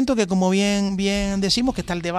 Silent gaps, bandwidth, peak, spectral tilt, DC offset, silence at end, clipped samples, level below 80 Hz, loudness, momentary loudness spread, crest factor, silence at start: none; 13.5 kHz; -6 dBFS; -5 dB/octave; under 0.1%; 0 s; under 0.1%; -40 dBFS; -21 LUFS; 4 LU; 14 dB; 0 s